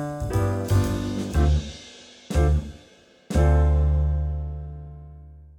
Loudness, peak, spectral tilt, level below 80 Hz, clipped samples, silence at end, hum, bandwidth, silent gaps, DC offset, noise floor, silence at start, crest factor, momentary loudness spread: -24 LUFS; -8 dBFS; -7 dB/octave; -26 dBFS; under 0.1%; 0.15 s; none; 12.5 kHz; none; under 0.1%; -53 dBFS; 0 s; 14 dB; 21 LU